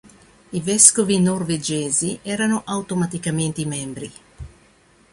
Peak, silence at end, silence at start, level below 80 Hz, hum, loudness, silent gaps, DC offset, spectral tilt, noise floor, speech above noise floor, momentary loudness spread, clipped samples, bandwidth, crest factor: 0 dBFS; 0.65 s; 0.5 s; -50 dBFS; none; -19 LUFS; none; under 0.1%; -3.5 dB/octave; -54 dBFS; 34 dB; 17 LU; under 0.1%; 15.5 kHz; 22 dB